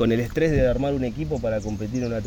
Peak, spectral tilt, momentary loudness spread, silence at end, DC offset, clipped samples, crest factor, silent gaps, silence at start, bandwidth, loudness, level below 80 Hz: -10 dBFS; -7.5 dB/octave; 7 LU; 0 s; under 0.1%; under 0.1%; 14 dB; none; 0 s; over 20 kHz; -24 LUFS; -36 dBFS